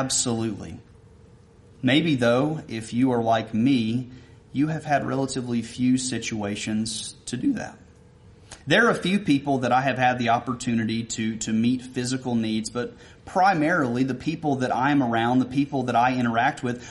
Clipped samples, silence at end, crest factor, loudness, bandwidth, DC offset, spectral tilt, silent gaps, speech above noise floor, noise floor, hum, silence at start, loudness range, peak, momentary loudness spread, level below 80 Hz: under 0.1%; 0 s; 18 dB; -24 LUFS; 11.5 kHz; under 0.1%; -5 dB/octave; none; 28 dB; -51 dBFS; none; 0 s; 4 LU; -6 dBFS; 10 LU; -56 dBFS